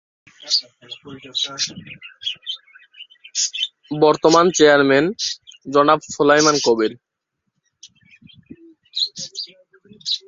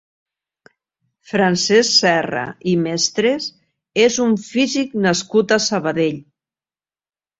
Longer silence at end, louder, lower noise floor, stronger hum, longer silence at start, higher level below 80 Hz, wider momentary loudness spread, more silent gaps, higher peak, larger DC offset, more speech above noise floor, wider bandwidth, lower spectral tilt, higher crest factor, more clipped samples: second, 0.1 s vs 1.2 s; about the same, -18 LUFS vs -17 LUFS; second, -77 dBFS vs under -90 dBFS; neither; second, 0.45 s vs 1.3 s; about the same, -62 dBFS vs -60 dBFS; first, 19 LU vs 10 LU; neither; about the same, -2 dBFS vs -2 dBFS; neither; second, 60 dB vs over 73 dB; about the same, 7.8 kHz vs 8 kHz; about the same, -3 dB/octave vs -3.5 dB/octave; about the same, 18 dB vs 18 dB; neither